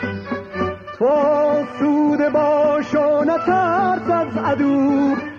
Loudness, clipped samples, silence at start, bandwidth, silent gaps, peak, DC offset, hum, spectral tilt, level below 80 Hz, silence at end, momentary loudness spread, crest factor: -18 LUFS; under 0.1%; 0 s; 7 kHz; none; -8 dBFS; under 0.1%; none; -7.5 dB/octave; -56 dBFS; 0 s; 9 LU; 10 dB